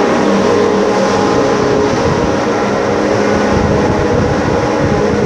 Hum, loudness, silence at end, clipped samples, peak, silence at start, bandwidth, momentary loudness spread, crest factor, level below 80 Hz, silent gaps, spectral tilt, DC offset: none; -12 LUFS; 0 s; under 0.1%; 0 dBFS; 0 s; 11 kHz; 2 LU; 12 dB; -30 dBFS; none; -6 dB/octave; under 0.1%